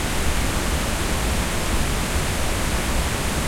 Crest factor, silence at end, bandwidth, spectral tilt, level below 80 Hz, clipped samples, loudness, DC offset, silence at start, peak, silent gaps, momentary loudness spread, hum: 12 dB; 0 s; 16.5 kHz; -3.5 dB/octave; -26 dBFS; under 0.1%; -23 LUFS; under 0.1%; 0 s; -8 dBFS; none; 0 LU; none